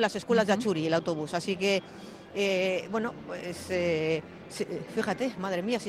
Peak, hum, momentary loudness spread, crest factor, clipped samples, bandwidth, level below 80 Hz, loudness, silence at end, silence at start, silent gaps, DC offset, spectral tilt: -12 dBFS; none; 11 LU; 18 dB; under 0.1%; 16 kHz; -64 dBFS; -30 LUFS; 0 s; 0 s; none; under 0.1%; -5 dB/octave